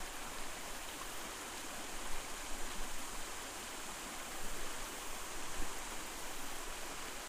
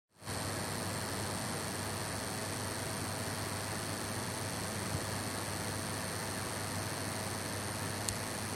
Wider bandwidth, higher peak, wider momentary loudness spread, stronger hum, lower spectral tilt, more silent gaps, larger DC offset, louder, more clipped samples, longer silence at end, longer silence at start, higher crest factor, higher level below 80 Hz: about the same, 15.5 kHz vs 16.5 kHz; second, -24 dBFS vs -10 dBFS; about the same, 1 LU vs 1 LU; neither; second, -1.5 dB/octave vs -3.5 dB/octave; neither; neither; second, -44 LUFS vs -37 LUFS; neither; about the same, 0 s vs 0 s; second, 0 s vs 0.2 s; second, 16 dB vs 28 dB; first, -50 dBFS vs -58 dBFS